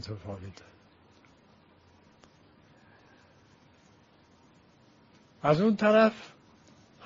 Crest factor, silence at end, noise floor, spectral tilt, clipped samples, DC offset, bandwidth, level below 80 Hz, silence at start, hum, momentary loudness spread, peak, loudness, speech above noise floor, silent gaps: 24 dB; 0.8 s; -61 dBFS; -5 dB/octave; under 0.1%; under 0.1%; 7.4 kHz; -66 dBFS; 0.05 s; none; 25 LU; -10 dBFS; -26 LUFS; 34 dB; none